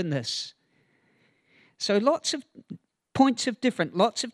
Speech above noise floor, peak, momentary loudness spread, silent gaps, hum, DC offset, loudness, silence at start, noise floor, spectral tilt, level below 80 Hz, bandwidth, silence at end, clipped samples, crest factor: 41 dB; -6 dBFS; 22 LU; none; none; under 0.1%; -26 LUFS; 0 s; -67 dBFS; -4 dB/octave; -68 dBFS; 12 kHz; 0.05 s; under 0.1%; 20 dB